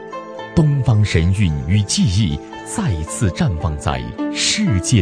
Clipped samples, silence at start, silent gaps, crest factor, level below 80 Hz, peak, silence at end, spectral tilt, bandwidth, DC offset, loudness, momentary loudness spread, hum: under 0.1%; 0 s; none; 16 dB; -32 dBFS; 0 dBFS; 0 s; -5 dB/octave; 11 kHz; under 0.1%; -18 LUFS; 8 LU; none